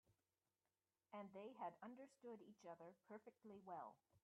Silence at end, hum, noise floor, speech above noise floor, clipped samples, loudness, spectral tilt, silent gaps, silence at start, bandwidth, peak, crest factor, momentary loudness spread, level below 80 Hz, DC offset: 0.05 s; none; under -90 dBFS; over 31 dB; under 0.1%; -60 LUFS; -5.5 dB/octave; none; 0.1 s; 7.2 kHz; -42 dBFS; 20 dB; 8 LU; under -90 dBFS; under 0.1%